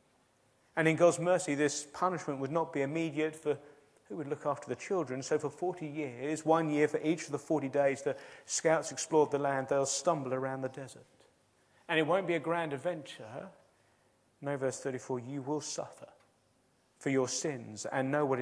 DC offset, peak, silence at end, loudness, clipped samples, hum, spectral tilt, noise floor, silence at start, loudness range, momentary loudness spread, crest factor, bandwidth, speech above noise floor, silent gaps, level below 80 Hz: under 0.1%; -12 dBFS; 0 s; -33 LUFS; under 0.1%; none; -4.5 dB/octave; -71 dBFS; 0.75 s; 7 LU; 11 LU; 22 dB; 11 kHz; 38 dB; none; -82 dBFS